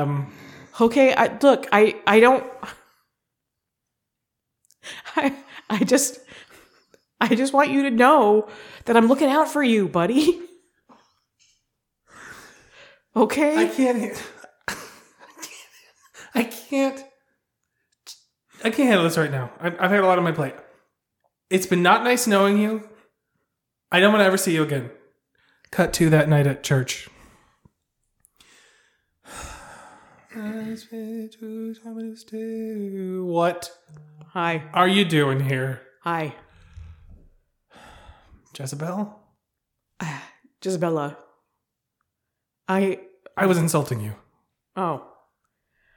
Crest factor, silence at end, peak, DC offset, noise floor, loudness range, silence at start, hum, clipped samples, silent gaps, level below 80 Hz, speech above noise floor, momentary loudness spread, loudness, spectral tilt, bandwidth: 22 dB; 0.95 s; -2 dBFS; under 0.1%; -82 dBFS; 15 LU; 0 s; none; under 0.1%; none; -58 dBFS; 61 dB; 20 LU; -21 LUFS; -5 dB/octave; 19 kHz